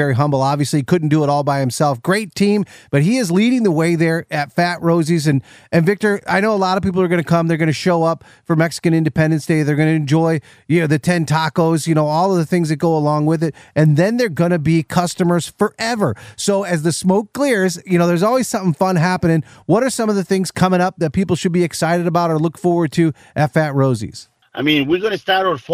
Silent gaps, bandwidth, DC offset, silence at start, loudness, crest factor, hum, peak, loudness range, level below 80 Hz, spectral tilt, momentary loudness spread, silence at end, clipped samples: none; 15 kHz; under 0.1%; 0 s; -17 LUFS; 14 dB; none; -2 dBFS; 1 LU; -52 dBFS; -6 dB/octave; 4 LU; 0 s; under 0.1%